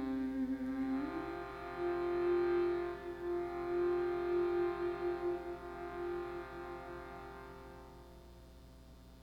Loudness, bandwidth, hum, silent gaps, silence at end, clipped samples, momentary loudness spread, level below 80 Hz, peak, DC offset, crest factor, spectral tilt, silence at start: -38 LUFS; 6.2 kHz; 60 Hz at -60 dBFS; none; 0 s; under 0.1%; 22 LU; -58 dBFS; -26 dBFS; under 0.1%; 14 dB; -7.5 dB/octave; 0 s